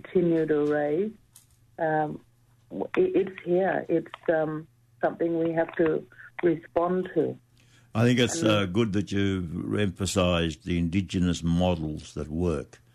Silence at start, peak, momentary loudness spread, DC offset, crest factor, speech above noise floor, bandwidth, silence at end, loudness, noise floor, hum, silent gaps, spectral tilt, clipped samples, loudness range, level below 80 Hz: 0.1 s; -12 dBFS; 10 LU; under 0.1%; 16 dB; 33 dB; 13 kHz; 0.3 s; -27 LUFS; -59 dBFS; none; none; -6 dB/octave; under 0.1%; 3 LU; -50 dBFS